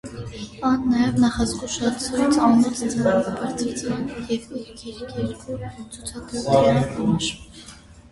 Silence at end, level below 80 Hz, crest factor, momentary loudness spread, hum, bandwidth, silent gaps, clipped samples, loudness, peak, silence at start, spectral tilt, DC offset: 0.05 s; -44 dBFS; 18 dB; 18 LU; none; 11.5 kHz; none; under 0.1%; -22 LUFS; -4 dBFS; 0.05 s; -5.5 dB/octave; under 0.1%